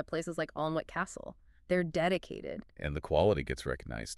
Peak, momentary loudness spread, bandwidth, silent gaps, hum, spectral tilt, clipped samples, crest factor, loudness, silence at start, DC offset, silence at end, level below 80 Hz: -14 dBFS; 13 LU; 13 kHz; none; none; -5.5 dB/octave; under 0.1%; 18 dB; -34 LUFS; 0 s; under 0.1%; 0.05 s; -50 dBFS